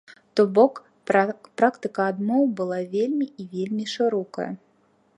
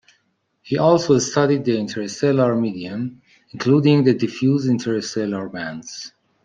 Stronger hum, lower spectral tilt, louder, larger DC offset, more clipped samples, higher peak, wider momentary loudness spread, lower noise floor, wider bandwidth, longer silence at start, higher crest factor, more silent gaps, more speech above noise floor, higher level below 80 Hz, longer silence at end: neither; about the same, -6.5 dB/octave vs -6 dB/octave; second, -24 LUFS vs -19 LUFS; neither; neither; about the same, -4 dBFS vs -2 dBFS; about the same, 12 LU vs 14 LU; second, -63 dBFS vs -67 dBFS; first, 10.5 kHz vs 9.4 kHz; second, 0.1 s vs 0.65 s; about the same, 20 dB vs 16 dB; neither; second, 40 dB vs 48 dB; second, -78 dBFS vs -62 dBFS; first, 0.6 s vs 0.35 s